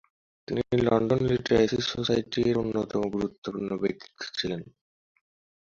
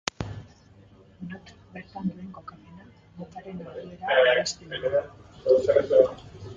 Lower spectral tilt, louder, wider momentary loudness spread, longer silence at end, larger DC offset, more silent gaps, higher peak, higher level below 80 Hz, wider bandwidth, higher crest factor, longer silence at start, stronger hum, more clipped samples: first, -6 dB/octave vs -4 dB/octave; second, -27 LUFS vs -24 LUFS; second, 10 LU vs 24 LU; first, 1 s vs 0 s; neither; first, 3.38-3.42 s vs none; second, -8 dBFS vs -2 dBFS; about the same, -54 dBFS vs -56 dBFS; about the same, 7.4 kHz vs 7.6 kHz; second, 20 dB vs 26 dB; first, 0.5 s vs 0.2 s; neither; neither